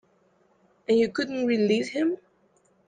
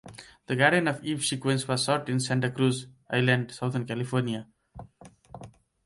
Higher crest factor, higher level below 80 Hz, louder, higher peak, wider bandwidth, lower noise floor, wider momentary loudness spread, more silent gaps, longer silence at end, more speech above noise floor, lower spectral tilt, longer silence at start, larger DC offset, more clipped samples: second, 16 dB vs 22 dB; second, -70 dBFS vs -64 dBFS; about the same, -25 LUFS vs -27 LUFS; second, -12 dBFS vs -8 dBFS; second, 9.4 kHz vs 11.5 kHz; first, -65 dBFS vs -53 dBFS; second, 9 LU vs 24 LU; neither; first, 0.7 s vs 0.35 s; first, 41 dB vs 26 dB; about the same, -5.5 dB/octave vs -5 dB/octave; first, 0.9 s vs 0.05 s; neither; neither